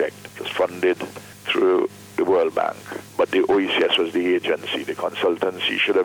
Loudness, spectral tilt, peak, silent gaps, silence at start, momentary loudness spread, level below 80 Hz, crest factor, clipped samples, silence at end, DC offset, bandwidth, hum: -21 LUFS; -4 dB/octave; -6 dBFS; none; 0 s; 10 LU; -64 dBFS; 14 dB; under 0.1%; 0 s; under 0.1%; over 20 kHz; none